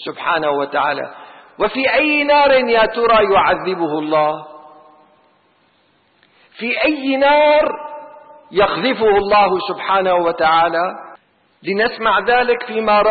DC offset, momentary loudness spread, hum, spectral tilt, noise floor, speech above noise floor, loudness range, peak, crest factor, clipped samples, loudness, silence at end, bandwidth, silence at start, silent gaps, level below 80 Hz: under 0.1%; 11 LU; none; -9.5 dB/octave; -58 dBFS; 43 dB; 6 LU; -4 dBFS; 12 dB; under 0.1%; -15 LUFS; 0 s; 4.8 kHz; 0 s; none; -48 dBFS